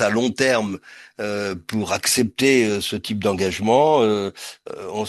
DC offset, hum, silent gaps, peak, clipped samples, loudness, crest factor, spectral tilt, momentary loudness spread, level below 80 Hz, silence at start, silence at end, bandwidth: under 0.1%; none; none; -2 dBFS; under 0.1%; -20 LUFS; 18 dB; -4 dB/octave; 14 LU; -56 dBFS; 0 s; 0 s; 12.5 kHz